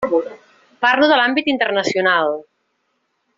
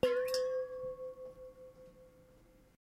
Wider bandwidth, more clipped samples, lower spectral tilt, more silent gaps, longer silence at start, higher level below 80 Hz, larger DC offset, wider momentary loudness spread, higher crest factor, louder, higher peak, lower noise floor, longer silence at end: second, 7.6 kHz vs 15.5 kHz; neither; second, -0.5 dB/octave vs -3.5 dB/octave; neither; about the same, 0 s vs 0.05 s; about the same, -62 dBFS vs -66 dBFS; neither; second, 9 LU vs 23 LU; second, 16 dB vs 22 dB; first, -16 LUFS vs -38 LUFS; first, -2 dBFS vs -16 dBFS; first, -69 dBFS vs -63 dBFS; about the same, 0.95 s vs 0.9 s